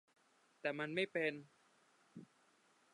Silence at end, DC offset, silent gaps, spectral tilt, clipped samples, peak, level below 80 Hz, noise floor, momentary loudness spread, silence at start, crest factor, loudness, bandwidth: 0.7 s; under 0.1%; none; -5.5 dB/octave; under 0.1%; -24 dBFS; under -90 dBFS; -74 dBFS; 22 LU; 0.65 s; 22 dB; -41 LUFS; 11 kHz